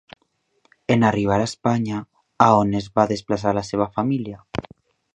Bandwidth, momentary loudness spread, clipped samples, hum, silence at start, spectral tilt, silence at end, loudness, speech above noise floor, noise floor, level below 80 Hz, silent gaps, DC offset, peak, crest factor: 10 kHz; 15 LU; under 0.1%; none; 0.9 s; -6.5 dB/octave; 0.55 s; -21 LUFS; 45 dB; -65 dBFS; -50 dBFS; none; under 0.1%; 0 dBFS; 22 dB